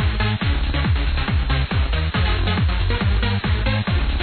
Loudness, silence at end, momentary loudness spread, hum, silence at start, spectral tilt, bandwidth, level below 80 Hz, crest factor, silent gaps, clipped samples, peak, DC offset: -21 LUFS; 0 s; 1 LU; none; 0 s; -9 dB/octave; 4.6 kHz; -22 dBFS; 10 dB; none; under 0.1%; -8 dBFS; under 0.1%